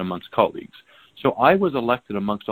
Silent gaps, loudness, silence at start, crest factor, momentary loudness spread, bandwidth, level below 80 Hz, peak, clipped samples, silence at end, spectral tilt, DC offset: none; -21 LUFS; 0 s; 22 dB; 9 LU; 18.5 kHz; -56 dBFS; 0 dBFS; under 0.1%; 0 s; -8.5 dB/octave; under 0.1%